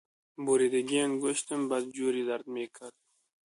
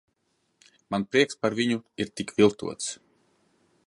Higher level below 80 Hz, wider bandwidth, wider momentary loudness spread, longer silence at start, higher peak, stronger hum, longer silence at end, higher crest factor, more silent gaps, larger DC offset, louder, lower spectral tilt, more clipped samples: second, -76 dBFS vs -64 dBFS; about the same, 11.5 kHz vs 11.5 kHz; about the same, 13 LU vs 11 LU; second, 0.4 s vs 0.9 s; second, -16 dBFS vs -8 dBFS; neither; second, 0.55 s vs 0.9 s; second, 16 dB vs 22 dB; neither; neither; second, -30 LUFS vs -26 LUFS; about the same, -3.5 dB/octave vs -4.5 dB/octave; neither